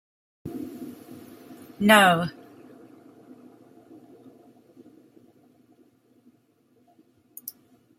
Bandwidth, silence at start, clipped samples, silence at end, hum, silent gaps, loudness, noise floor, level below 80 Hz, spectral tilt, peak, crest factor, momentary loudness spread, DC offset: 16 kHz; 0.45 s; under 0.1%; 0.5 s; none; none; -21 LUFS; -64 dBFS; -70 dBFS; -4 dB/octave; -2 dBFS; 26 dB; 30 LU; under 0.1%